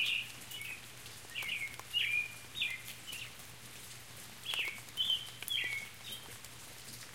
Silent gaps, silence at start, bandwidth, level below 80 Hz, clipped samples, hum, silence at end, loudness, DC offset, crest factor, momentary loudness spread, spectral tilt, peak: none; 0 s; 17 kHz; -70 dBFS; under 0.1%; none; 0 s; -37 LUFS; 0.1%; 24 dB; 15 LU; 0 dB/octave; -16 dBFS